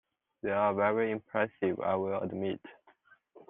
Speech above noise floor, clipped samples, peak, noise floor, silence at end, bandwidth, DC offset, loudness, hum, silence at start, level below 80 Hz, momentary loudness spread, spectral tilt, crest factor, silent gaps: 33 dB; under 0.1%; -14 dBFS; -64 dBFS; 0.1 s; 3.9 kHz; under 0.1%; -32 LUFS; none; 0.45 s; -76 dBFS; 9 LU; -5 dB/octave; 20 dB; none